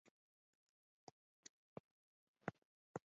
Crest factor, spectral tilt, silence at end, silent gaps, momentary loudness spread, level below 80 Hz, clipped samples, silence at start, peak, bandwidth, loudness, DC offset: 30 dB; -5.5 dB/octave; 0.05 s; 0.11-1.43 s, 1.49-2.34 s, 2.58-2.94 s; 14 LU; -86 dBFS; under 0.1%; 0.05 s; -30 dBFS; 7.4 kHz; -59 LUFS; under 0.1%